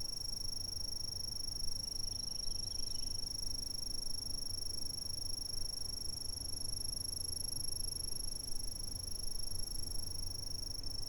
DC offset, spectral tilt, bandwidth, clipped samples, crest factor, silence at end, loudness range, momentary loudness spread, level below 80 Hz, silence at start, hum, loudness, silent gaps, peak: under 0.1%; -1.5 dB/octave; over 20 kHz; under 0.1%; 14 dB; 0 s; 1 LU; 3 LU; -48 dBFS; 0 s; none; -40 LUFS; none; -26 dBFS